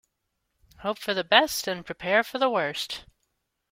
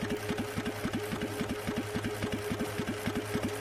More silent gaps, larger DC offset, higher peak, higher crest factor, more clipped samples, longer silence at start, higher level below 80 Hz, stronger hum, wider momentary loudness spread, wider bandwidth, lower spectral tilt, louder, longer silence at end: neither; neither; first, -2 dBFS vs -18 dBFS; first, 26 dB vs 16 dB; neither; first, 0.8 s vs 0 s; second, -62 dBFS vs -52 dBFS; neither; first, 13 LU vs 1 LU; first, 16.5 kHz vs 14.5 kHz; second, -2.5 dB/octave vs -5 dB/octave; first, -25 LUFS vs -35 LUFS; first, 0.7 s vs 0 s